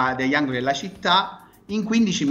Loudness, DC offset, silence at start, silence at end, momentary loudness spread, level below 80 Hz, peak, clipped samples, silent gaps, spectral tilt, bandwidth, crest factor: -22 LUFS; under 0.1%; 0 s; 0 s; 9 LU; -56 dBFS; -6 dBFS; under 0.1%; none; -4 dB/octave; 8 kHz; 16 dB